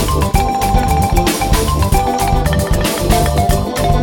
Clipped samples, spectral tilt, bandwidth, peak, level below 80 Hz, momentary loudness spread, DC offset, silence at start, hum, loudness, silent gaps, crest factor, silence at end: under 0.1%; -5 dB/octave; 19 kHz; 0 dBFS; -18 dBFS; 2 LU; under 0.1%; 0 s; none; -14 LUFS; none; 14 dB; 0 s